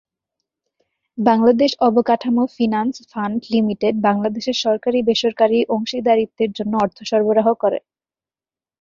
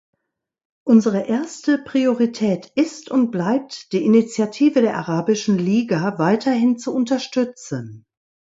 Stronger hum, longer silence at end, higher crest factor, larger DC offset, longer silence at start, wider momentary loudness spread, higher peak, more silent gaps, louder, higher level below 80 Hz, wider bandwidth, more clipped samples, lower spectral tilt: neither; first, 1 s vs 0.6 s; about the same, 16 dB vs 16 dB; neither; first, 1.15 s vs 0.85 s; about the same, 7 LU vs 7 LU; about the same, -2 dBFS vs -4 dBFS; neither; about the same, -18 LUFS vs -19 LUFS; first, -60 dBFS vs -66 dBFS; about the same, 7.4 kHz vs 8 kHz; neither; about the same, -5.5 dB/octave vs -6 dB/octave